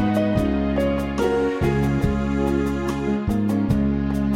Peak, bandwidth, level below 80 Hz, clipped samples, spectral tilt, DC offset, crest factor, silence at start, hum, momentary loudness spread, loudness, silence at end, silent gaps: -8 dBFS; 15 kHz; -32 dBFS; under 0.1%; -8 dB/octave; under 0.1%; 14 dB; 0 s; none; 2 LU; -22 LUFS; 0 s; none